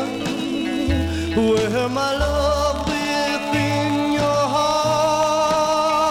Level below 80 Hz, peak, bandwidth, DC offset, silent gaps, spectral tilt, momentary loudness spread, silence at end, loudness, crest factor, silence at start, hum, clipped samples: -36 dBFS; -6 dBFS; 17 kHz; under 0.1%; none; -5 dB/octave; 4 LU; 0 s; -20 LUFS; 12 dB; 0 s; none; under 0.1%